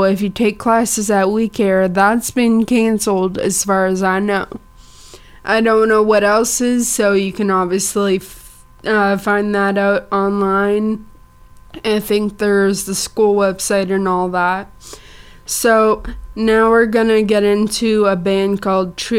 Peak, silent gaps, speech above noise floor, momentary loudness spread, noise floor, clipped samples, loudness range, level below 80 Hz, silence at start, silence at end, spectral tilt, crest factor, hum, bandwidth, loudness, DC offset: -2 dBFS; none; 27 dB; 8 LU; -42 dBFS; under 0.1%; 3 LU; -42 dBFS; 0 s; 0 s; -4.5 dB/octave; 14 dB; none; 16.5 kHz; -15 LUFS; under 0.1%